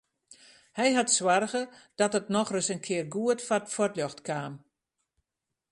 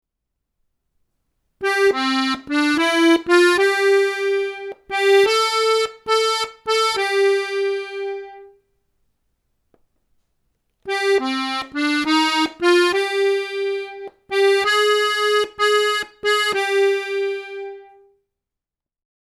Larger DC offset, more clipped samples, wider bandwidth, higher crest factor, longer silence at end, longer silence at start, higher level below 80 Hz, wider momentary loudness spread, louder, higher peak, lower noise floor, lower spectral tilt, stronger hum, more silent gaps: neither; neither; second, 11.5 kHz vs 14.5 kHz; about the same, 20 dB vs 20 dB; second, 1.15 s vs 1.55 s; second, 0.3 s vs 1.6 s; second, -74 dBFS vs -64 dBFS; about the same, 11 LU vs 11 LU; second, -28 LUFS vs -18 LUFS; second, -10 dBFS vs 0 dBFS; about the same, -87 dBFS vs -87 dBFS; first, -3 dB/octave vs -1.5 dB/octave; neither; neither